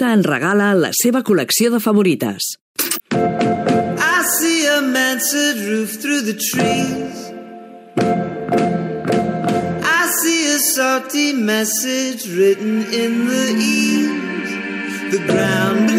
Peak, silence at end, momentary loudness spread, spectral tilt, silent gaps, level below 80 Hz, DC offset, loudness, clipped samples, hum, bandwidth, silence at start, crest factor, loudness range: -4 dBFS; 0 s; 8 LU; -3.5 dB/octave; 2.61-2.75 s; -58 dBFS; under 0.1%; -16 LUFS; under 0.1%; none; 16.5 kHz; 0 s; 12 dB; 4 LU